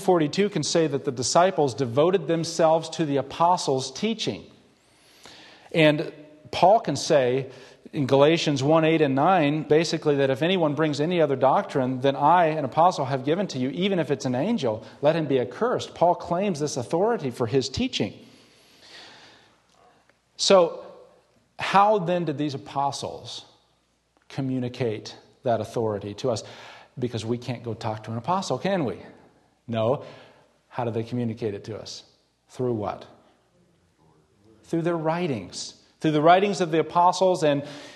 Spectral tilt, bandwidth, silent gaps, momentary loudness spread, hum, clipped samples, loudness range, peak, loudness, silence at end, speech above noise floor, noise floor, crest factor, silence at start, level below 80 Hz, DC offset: -5 dB/octave; 12.5 kHz; none; 14 LU; none; under 0.1%; 9 LU; -4 dBFS; -24 LUFS; 0 s; 44 dB; -67 dBFS; 20 dB; 0 s; -62 dBFS; under 0.1%